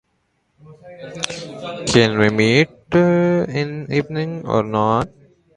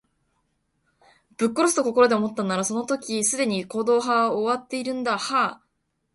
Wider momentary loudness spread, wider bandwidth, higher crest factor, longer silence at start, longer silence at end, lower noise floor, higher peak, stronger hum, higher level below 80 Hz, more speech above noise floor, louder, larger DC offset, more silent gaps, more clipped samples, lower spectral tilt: first, 14 LU vs 8 LU; about the same, 11.5 kHz vs 11.5 kHz; about the same, 20 dB vs 20 dB; second, 0.7 s vs 1.4 s; about the same, 0.5 s vs 0.6 s; second, -67 dBFS vs -74 dBFS; first, 0 dBFS vs -4 dBFS; neither; first, -48 dBFS vs -68 dBFS; about the same, 49 dB vs 51 dB; first, -18 LUFS vs -23 LUFS; neither; neither; neither; first, -5.5 dB/octave vs -3.5 dB/octave